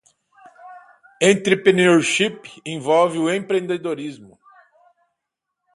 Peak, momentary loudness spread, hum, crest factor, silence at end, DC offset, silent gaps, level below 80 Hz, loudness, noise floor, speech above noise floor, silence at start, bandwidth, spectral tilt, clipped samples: 0 dBFS; 15 LU; none; 20 dB; 1.5 s; under 0.1%; none; -66 dBFS; -18 LUFS; -81 dBFS; 62 dB; 0.65 s; 11.5 kHz; -4.5 dB/octave; under 0.1%